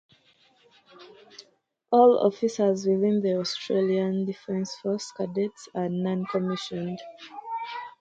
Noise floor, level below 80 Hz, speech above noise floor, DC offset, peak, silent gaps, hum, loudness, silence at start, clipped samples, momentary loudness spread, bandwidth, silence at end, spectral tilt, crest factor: -65 dBFS; -72 dBFS; 40 dB; under 0.1%; -6 dBFS; none; none; -26 LUFS; 1 s; under 0.1%; 15 LU; 8.8 kHz; 0.1 s; -6 dB/octave; 20 dB